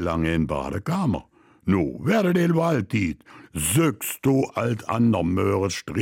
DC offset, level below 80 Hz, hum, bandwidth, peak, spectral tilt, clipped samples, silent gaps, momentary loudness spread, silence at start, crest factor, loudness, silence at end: under 0.1%; -44 dBFS; none; 17 kHz; -10 dBFS; -6 dB/octave; under 0.1%; none; 7 LU; 0 s; 14 dB; -23 LUFS; 0 s